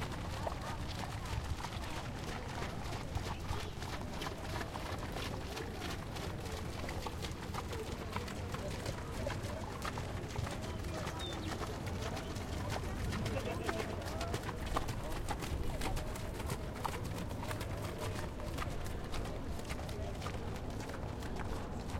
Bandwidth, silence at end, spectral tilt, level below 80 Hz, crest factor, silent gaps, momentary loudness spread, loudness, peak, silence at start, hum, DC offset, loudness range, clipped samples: 16.5 kHz; 0 s; -5 dB/octave; -46 dBFS; 20 dB; none; 3 LU; -41 LUFS; -20 dBFS; 0 s; none; under 0.1%; 2 LU; under 0.1%